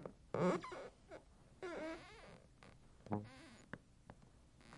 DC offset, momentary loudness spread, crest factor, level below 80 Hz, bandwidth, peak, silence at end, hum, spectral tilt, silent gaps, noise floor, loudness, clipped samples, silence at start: under 0.1%; 25 LU; 22 dB; -70 dBFS; 11.5 kHz; -26 dBFS; 0 s; none; -6.5 dB/octave; none; -66 dBFS; -46 LUFS; under 0.1%; 0 s